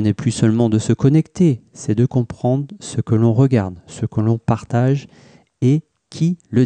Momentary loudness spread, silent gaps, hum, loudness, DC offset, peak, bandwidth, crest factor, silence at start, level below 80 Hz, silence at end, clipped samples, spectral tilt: 9 LU; none; none; -18 LUFS; under 0.1%; -4 dBFS; 9.4 kHz; 14 dB; 0 s; -48 dBFS; 0 s; under 0.1%; -7.5 dB/octave